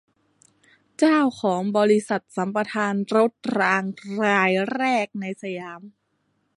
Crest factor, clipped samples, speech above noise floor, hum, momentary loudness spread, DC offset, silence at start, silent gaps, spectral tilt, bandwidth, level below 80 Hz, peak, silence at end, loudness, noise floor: 18 dB; under 0.1%; 48 dB; none; 12 LU; under 0.1%; 1 s; none; -5.5 dB/octave; 11.5 kHz; -72 dBFS; -4 dBFS; 0.7 s; -22 LUFS; -71 dBFS